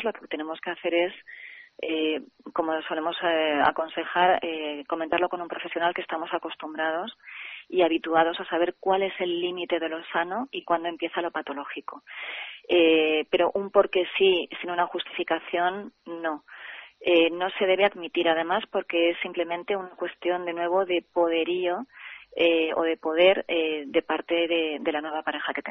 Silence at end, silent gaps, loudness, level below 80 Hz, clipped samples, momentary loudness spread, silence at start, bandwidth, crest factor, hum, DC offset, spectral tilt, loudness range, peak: 0 s; none; -26 LUFS; -68 dBFS; under 0.1%; 13 LU; 0 s; 4.5 kHz; 20 dB; none; under 0.1%; -1 dB/octave; 4 LU; -6 dBFS